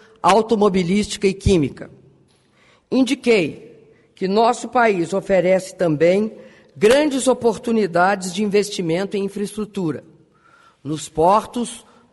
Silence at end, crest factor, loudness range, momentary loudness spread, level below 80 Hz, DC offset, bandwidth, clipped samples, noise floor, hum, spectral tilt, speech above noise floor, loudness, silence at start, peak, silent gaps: 0.35 s; 16 dB; 5 LU; 11 LU; -42 dBFS; under 0.1%; 11.5 kHz; under 0.1%; -56 dBFS; none; -5 dB/octave; 38 dB; -19 LUFS; 0.25 s; -2 dBFS; none